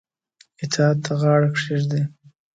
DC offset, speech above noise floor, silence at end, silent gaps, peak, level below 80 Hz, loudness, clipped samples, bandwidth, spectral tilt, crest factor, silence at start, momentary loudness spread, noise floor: under 0.1%; 39 dB; 0.45 s; none; -4 dBFS; -64 dBFS; -21 LUFS; under 0.1%; 9 kHz; -6 dB/octave; 18 dB; 0.6 s; 9 LU; -58 dBFS